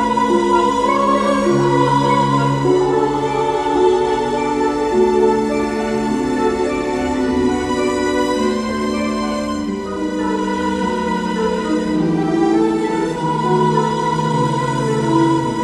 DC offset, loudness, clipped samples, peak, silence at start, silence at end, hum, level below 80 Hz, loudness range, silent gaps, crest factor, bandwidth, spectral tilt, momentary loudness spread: under 0.1%; -17 LUFS; under 0.1%; -2 dBFS; 0 s; 0 s; none; -40 dBFS; 4 LU; none; 14 dB; 12.5 kHz; -6 dB/octave; 5 LU